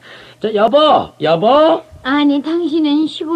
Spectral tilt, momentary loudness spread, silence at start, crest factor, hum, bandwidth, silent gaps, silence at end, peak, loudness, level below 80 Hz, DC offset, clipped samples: -6.5 dB/octave; 8 LU; 0.1 s; 12 dB; none; 9 kHz; none; 0 s; -2 dBFS; -13 LUFS; -52 dBFS; under 0.1%; under 0.1%